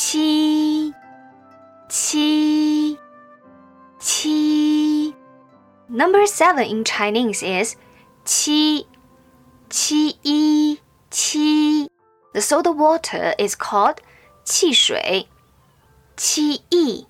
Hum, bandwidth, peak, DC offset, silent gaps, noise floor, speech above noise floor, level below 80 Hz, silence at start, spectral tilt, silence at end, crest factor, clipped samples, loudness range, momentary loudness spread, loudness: none; 16 kHz; -4 dBFS; under 0.1%; none; -55 dBFS; 37 dB; -64 dBFS; 0 s; -2 dB/octave; 0.1 s; 16 dB; under 0.1%; 3 LU; 10 LU; -18 LUFS